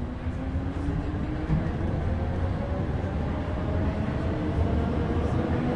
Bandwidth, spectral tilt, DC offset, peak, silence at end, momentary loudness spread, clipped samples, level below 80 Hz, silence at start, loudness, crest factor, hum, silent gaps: 8.2 kHz; -9 dB/octave; under 0.1%; -14 dBFS; 0 s; 4 LU; under 0.1%; -34 dBFS; 0 s; -29 LUFS; 12 dB; none; none